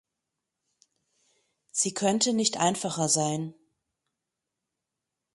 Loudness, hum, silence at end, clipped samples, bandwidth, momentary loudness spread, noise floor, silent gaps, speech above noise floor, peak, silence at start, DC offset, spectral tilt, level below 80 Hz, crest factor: -26 LUFS; none; 1.85 s; under 0.1%; 11.5 kHz; 9 LU; -86 dBFS; none; 59 dB; -8 dBFS; 1.75 s; under 0.1%; -3 dB/octave; -74 dBFS; 22 dB